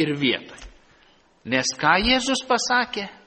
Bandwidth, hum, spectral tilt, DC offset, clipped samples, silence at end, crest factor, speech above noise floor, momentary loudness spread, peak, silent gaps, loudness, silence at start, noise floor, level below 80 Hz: 8.8 kHz; none; -3 dB/octave; under 0.1%; under 0.1%; 0.15 s; 20 dB; 34 dB; 10 LU; -4 dBFS; none; -21 LUFS; 0 s; -57 dBFS; -46 dBFS